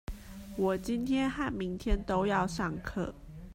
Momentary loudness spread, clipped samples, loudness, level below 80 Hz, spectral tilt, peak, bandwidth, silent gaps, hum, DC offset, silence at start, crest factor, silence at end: 13 LU; under 0.1%; -33 LUFS; -42 dBFS; -6 dB/octave; -16 dBFS; 16 kHz; none; none; under 0.1%; 0.1 s; 16 dB; 0 s